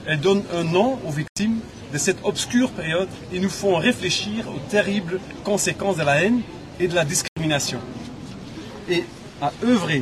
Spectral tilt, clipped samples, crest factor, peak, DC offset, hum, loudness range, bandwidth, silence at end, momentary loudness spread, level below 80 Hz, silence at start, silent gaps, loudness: -4 dB/octave; under 0.1%; 18 dB; -6 dBFS; under 0.1%; none; 2 LU; 13 kHz; 0 s; 13 LU; -50 dBFS; 0 s; 1.29-1.36 s, 7.28-7.36 s; -22 LUFS